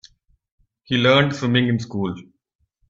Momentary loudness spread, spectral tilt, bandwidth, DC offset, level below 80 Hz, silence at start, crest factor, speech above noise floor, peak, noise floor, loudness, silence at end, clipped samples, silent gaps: 12 LU; -6 dB/octave; 7.6 kHz; under 0.1%; -58 dBFS; 0.9 s; 20 dB; 49 dB; -2 dBFS; -68 dBFS; -19 LUFS; 0.7 s; under 0.1%; none